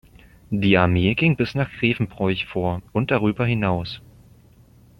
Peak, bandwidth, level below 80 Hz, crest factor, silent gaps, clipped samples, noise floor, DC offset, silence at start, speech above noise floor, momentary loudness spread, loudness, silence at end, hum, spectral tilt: -2 dBFS; 10.5 kHz; -46 dBFS; 20 dB; none; under 0.1%; -51 dBFS; under 0.1%; 0.5 s; 31 dB; 9 LU; -21 LUFS; 1 s; none; -8 dB/octave